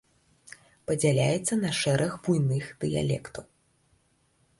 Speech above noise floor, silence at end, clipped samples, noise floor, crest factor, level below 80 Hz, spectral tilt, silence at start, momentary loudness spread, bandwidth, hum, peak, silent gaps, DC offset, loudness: 42 dB; 1.15 s; under 0.1%; -68 dBFS; 18 dB; -58 dBFS; -5.5 dB/octave; 0.5 s; 11 LU; 11.5 kHz; none; -12 dBFS; none; under 0.1%; -27 LUFS